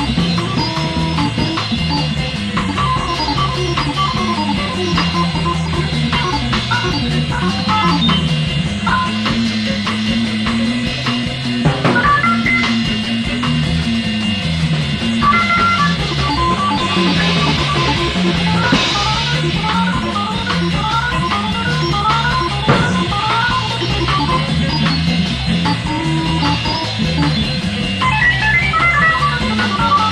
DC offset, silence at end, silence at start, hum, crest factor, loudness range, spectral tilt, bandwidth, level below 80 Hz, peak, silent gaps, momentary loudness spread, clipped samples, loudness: under 0.1%; 0 s; 0 s; none; 16 dB; 3 LU; -5 dB/octave; 11.5 kHz; -30 dBFS; 0 dBFS; none; 5 LU; under 0.1%; -15 LUFS